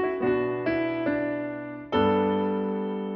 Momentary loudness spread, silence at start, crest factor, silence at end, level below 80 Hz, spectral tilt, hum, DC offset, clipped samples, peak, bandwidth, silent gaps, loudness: 7 LU; 0 s; 14 dB; 0 s; -56 dBFS; -9 dB/octave; none; under 0.1%; under 0.1%; -12 dBFS; 5.8 kHz; none; -27 LUFS